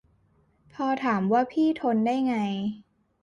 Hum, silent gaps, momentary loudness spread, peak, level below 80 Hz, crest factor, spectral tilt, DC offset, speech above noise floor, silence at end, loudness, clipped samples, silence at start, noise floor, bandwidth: none; none; 8 LU; -12 dBFS; -68 dBFS; 14 dB; -7.5 dB/octave; under 0.1%; 40 dB; 0.4 s; -26 LUFS; under 0.1%; 0.75 s; -65 dBFS; 10 kHz